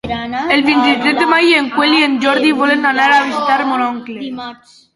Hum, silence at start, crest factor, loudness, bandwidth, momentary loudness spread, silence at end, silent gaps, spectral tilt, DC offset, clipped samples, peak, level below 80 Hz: none; 0.05 s; 14 dB; -12 LUFS; 11.5 kHz; 14 LU; 0.4 s; none; -3.5 dB/octave; under 0.1%; under 0.1%; 0 dBFS; -48 dBFS